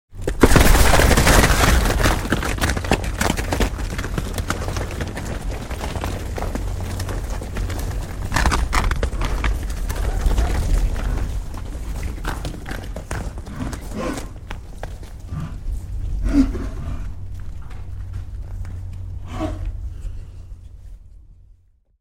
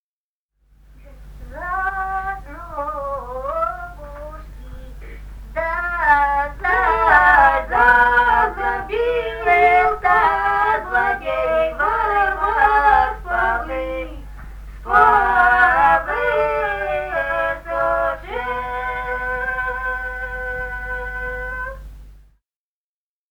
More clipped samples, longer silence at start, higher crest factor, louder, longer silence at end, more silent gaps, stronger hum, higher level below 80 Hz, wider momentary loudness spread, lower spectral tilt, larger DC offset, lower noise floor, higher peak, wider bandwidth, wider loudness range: neither; second, 0.1 s vs 1 s; about the same, 20 dB vs 18 dB; second, -22 LUFS vs -18 LUFS; second, 0.7 s vs 1.15 s; neither; neither; first, -24 dBFS vs -36 dBFS; about the same, 20 LU vs 21 LU; about the same, -4.5 dB/octave vs -5.5 dB/octave; neither; second, -53 dBFS vs under -90 dBFS; about the same, 0 dBFS vs 0 dBFS; second, 17 kHz vs over 20 kHz; about the same, 14 LU vs 13 LU